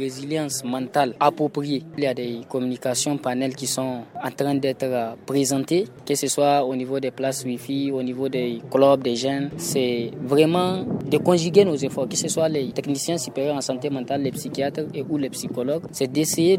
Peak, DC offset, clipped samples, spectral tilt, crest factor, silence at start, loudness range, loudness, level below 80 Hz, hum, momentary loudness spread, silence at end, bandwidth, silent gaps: -4 dBFS; under 0.1%; under 0.1%; -4.5 dB/octave; 20 dB; 0 s; 4 LU; -23 LUFS; -64 dBFS; none; 8 LU; 0 s; 16.5 kHz; none